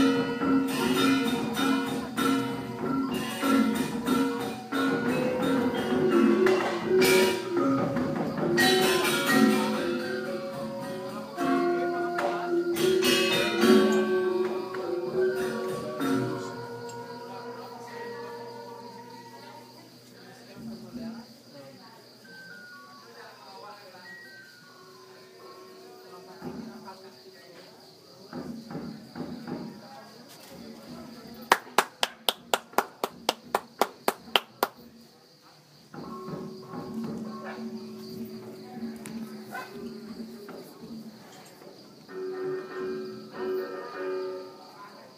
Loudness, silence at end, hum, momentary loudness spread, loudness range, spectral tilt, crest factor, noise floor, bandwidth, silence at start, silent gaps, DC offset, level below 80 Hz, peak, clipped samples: -28 LUFS; 0 s; none; 24 LU; 21 LU; -4 dB/octave; 30 dB; -56 dBFS; 15.5 kHz; 0 s; none; under 0.1%; -66 dBFS; 0 dBFS; under 0.1%